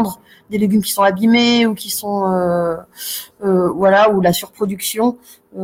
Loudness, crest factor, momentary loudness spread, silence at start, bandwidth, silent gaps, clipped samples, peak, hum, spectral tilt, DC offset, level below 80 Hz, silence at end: -16 LUFS; 14 dB; 13 LU; 0 s; 17 kHz; none; under 0.1%; -2 dBFS; none; -4.5 dB/octave; under 0.1%; -54 dBFS; 0 s